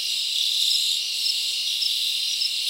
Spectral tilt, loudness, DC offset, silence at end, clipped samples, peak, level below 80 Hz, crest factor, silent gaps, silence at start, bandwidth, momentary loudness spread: 5 dB/octave; -21 LUFS; under 0.1%; 0 s; under 0.1%; -10 dBFS; -74 dBFS; 16 dB; none; 0 s; 16 kHz; 3 LU